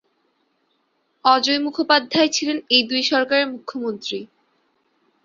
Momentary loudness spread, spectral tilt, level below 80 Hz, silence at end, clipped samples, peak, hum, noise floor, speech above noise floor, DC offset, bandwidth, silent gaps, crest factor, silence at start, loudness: 12 LU; -2 dB/octave; -68 dBFS; 1 s; under 0.1%; 0 dBFS; none; -68 dBFS; 48 dB; under 0.1%; 7.6 kHz; none; 22 dB; 1.25 s; -19 LUFS